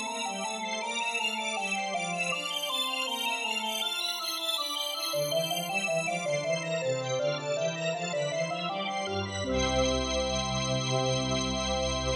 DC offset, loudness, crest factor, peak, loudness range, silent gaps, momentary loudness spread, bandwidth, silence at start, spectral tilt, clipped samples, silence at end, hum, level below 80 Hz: under 0.1%; -30 LUFS; 16 dB; -14 dBFS; 1 LU; none; 4 LU; 16.5 kHz; 0 s; -3 dB/octave; under 0.1%; 0 s; none; -48 dBFS